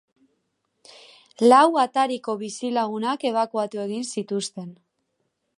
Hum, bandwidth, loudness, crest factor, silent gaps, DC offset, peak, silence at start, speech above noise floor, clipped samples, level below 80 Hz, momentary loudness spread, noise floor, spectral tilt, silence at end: none; 11.5 kHz; -22 LUFS; 20 dB; none; under 0.1%; -4 dBFS; 1.4 s; 53 dB; under 0.1%; -80 dBFS; 14 LU; -75 dBFS; -4 dB/octave; 0.85 s